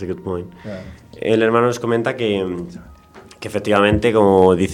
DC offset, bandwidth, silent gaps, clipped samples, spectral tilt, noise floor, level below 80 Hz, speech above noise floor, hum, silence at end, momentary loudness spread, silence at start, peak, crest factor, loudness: under 0.1%; 13 kHz; none; under 0.1%; -6.5 dB/octave; -43 dBFS; -42 dBFS; 26 dB; none; 0 s; 19 LU; 0 s; 0 dBFS; 18 dB; -17 LUFS